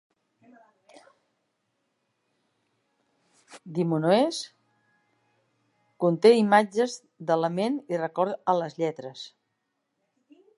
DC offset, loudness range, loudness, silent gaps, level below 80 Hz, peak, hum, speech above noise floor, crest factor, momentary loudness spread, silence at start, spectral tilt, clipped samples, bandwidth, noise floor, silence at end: under 0.1%; 6 LU; -25 LUFS; none; -80 dBFS; -6 dBFS; none; 54 dB; 22 dB; 18 LU; 3.5 s; -6 dB/octave; under 0.1%; 11.5 kHz; -79 dBFS; 1.3 s